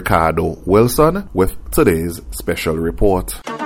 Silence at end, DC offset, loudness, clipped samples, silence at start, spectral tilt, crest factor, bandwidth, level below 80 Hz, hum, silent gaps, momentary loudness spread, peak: 0 s; under 0.1%; -17 LUFS; under 0.1%; 0 s; -6 dB/octave; 16 dB; 17.5 kHz; -28 dBFS; none; none; 9 LU; 0 dBFS